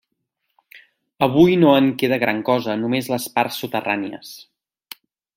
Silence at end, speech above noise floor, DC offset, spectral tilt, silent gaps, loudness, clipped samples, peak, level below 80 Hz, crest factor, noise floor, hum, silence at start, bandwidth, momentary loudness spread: 0.95 s; 56 dB; under 0.1%; -6 dB/octave; none; -18 LUFS; under 0.1%; -2 dBFS; -58 dBFS; 20 dB; -75 dBFS; none; 0.75 s; 16.5 kHz; 25 LU